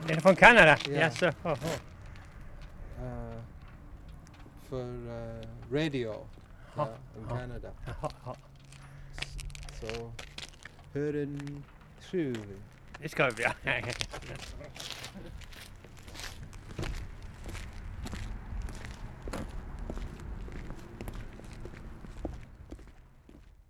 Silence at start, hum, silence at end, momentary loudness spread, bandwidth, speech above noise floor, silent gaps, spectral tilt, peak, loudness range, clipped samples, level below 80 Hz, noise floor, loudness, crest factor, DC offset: 0 s; none; 0.05 s; 22 LU; 16.5 kHz; 25 dB; none; -5 dB/octave; -2 dBFS; 10 LU; under 0.1%; -46 dBFS; -55 dBFS; -30 LUFS; 32 dB; under 0.1%